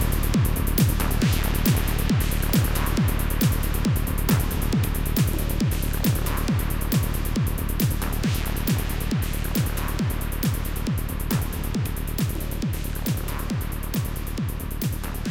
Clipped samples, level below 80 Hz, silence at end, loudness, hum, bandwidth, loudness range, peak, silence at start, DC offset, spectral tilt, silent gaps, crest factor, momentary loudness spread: under 0.1%; -28 dBFS; 0 s; -25 LUFS; none; 17 kHz; 5 LU; -8 dBFS; 0 s; 0.4%; -5.5 dB/octave; none; 14 dB; 6 LU